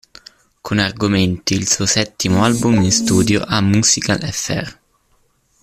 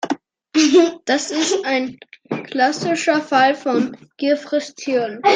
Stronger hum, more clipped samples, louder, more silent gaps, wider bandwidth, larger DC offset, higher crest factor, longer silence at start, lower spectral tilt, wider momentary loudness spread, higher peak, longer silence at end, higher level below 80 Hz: neither; neither; first, -15 LUFS vs -18 LUFS; neither; first, 15 kHz vs 9.8 kHz; neither; about the same, 16 dB vs 16 dB; first, 0.65 s vs 0.05 s; about the same, -4 dB/octave vs -3 dB/octave; second, 8 LU vs 12 LU; about the same, -2 dBFS vs -2 dBFS; first, 0.9 s vs 0 s; first, -44 dBFS vs -70 dBFS